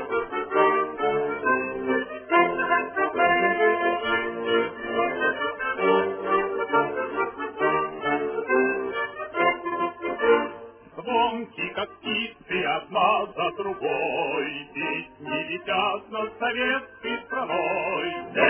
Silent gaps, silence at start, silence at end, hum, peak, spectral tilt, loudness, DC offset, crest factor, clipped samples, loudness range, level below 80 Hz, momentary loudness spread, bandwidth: none; 0 s; 0 s; none; -6 dBFS; -8 dB/octave; -25 LUFS; under 0.1%; 18 dB; under 0.1%; 4 LU; -62 dBFS; 8 LU; 3.5 kHz